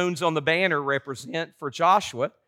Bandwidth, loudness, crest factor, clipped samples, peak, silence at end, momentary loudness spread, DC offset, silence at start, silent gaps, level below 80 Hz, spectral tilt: 16.5 kHz; -24 LUFS; 18 dB; under 0.1%; -8 dBFS; 0.2 s; 11 LU; under 0.1%; 0 s; none; -70 dBFS; -4.5 dB/octave